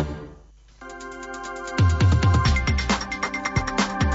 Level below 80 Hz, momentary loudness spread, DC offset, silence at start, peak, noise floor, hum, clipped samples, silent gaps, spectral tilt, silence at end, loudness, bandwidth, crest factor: -30 dBFS; 19 LU; under 0.1%; 0 s; -8 dBFS; -48 dBFS; none; under 0.1%; none; -5.5 dB/octave; 0 s; -22 LUFS; 8 kHz; 14 dB